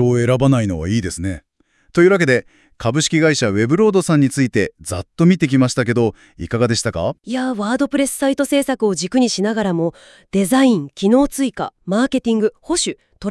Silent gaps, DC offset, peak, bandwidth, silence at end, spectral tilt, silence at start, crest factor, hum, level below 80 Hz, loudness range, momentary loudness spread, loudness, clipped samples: none; under 0.1%; 0 dBFS; 12 kHz; 0 s; -5.5 dB/octave; 0 s; 16 dB; none; -46 dBFS; 3 LU; 9 LU; -17 LUFS; under 0.1%